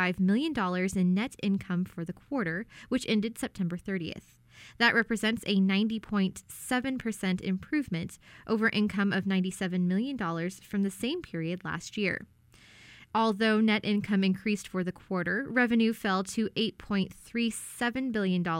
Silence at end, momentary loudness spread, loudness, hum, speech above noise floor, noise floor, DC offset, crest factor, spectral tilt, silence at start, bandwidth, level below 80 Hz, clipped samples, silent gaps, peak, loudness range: 0 s; 9 LU; -30 LUFS; none; 27 dB; -56 dBFS; under 0.1%; 20 dB; -5.5 dB/octave; 0 s; 16 kHz; -60 dBFS; under 0.1%; none; -10 dBFS; 4 LU